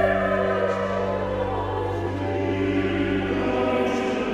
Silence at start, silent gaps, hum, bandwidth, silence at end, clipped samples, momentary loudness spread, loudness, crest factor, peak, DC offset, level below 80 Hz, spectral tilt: 0 s; none; none; 10.5 kHz; 0 s; under 0.1%; 4 LU; -24 LUFS; 16 dB; -8 dBFS; under 0.1%; -42 dBFS; -7 dB/octave